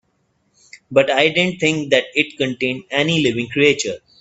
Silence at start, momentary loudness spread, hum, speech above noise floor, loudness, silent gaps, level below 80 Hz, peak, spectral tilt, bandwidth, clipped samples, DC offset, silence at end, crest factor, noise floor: 0.75 s; 6 LU; none; 47 dB; -17 LUFS; none; -58 dBFS; 0 dBFS; -4 dB/octave; 8.2 kHz; under 0.1%; under 0.1%; 0.25 s; 18 dB; -65 dBFS